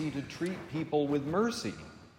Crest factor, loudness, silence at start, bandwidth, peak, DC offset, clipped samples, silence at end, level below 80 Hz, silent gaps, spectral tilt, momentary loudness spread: 16 dB; -33 LUFS; 0 s; 16 kHz; -18 dBFS; under 0.1%; under 0.1%; 0.1 s; -64 dBFS; none; -6 dB/octave; 8 LU